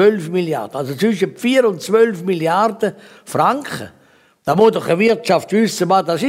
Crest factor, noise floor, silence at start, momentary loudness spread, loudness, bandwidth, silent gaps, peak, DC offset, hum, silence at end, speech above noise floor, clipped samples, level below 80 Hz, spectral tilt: 14 dB; -52 dBFS; 0 s; 10 LU; -16 LUFS; 16 kHz; none; -2 dBFS; under 0.1%; none; 0 s; 36 dB; under 0.1%; -62 dBFS; -5.5 dB/octave